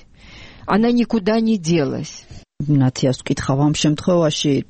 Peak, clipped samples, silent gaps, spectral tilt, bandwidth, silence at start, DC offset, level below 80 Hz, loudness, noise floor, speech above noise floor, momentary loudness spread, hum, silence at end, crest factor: -6 dBFS; under 0.1%; none; -6 dB/octave; 8.8 kHz; 0.25 s; 0.2%; -44 dBFS; -18 LUFS; -41 dBFS; 24 dB; 12 LU; none; 0.05 s; 12 dB